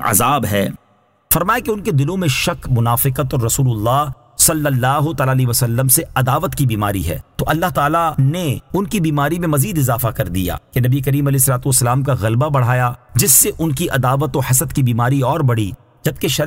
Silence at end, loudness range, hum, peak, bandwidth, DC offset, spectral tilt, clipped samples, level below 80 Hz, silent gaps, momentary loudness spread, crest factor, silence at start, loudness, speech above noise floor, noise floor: 0 s; 3 LU; none; 0 dBFS; 16.5 kHz; under 0.1%; -4.5 dB/octave; under 0.1%; -36 dBFS; none; 7 LU; 16 dB; 0 s; -16 LUFS; 40 dB; -56 dBFS